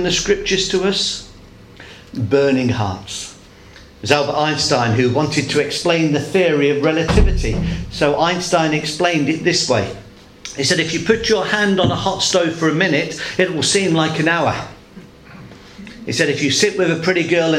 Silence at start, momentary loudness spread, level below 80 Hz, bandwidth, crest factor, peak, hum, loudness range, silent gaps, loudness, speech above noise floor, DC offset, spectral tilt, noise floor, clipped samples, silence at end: 0 s; 11 LU; -30 dBFS; 15.5 kHz; 18 dB; 0 dBFS; none; 3 LU; none; -17 LUFS; 25 dB; under 0.1%; -4 dB/octave; -41 dBFS; under 0.1%; 0 s